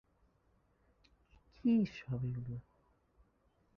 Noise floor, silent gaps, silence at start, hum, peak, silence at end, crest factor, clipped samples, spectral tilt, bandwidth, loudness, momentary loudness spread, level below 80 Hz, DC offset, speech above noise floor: -74 dBFS; none; 1.65 s; none; -22 dBFS; 1.15 s; 18 dB; under 0.1%; -8.5 dB/octave; 6.4 kHz; -37 LUFS; 14 LU; -66 dBFS; under 0.1%; 39 dB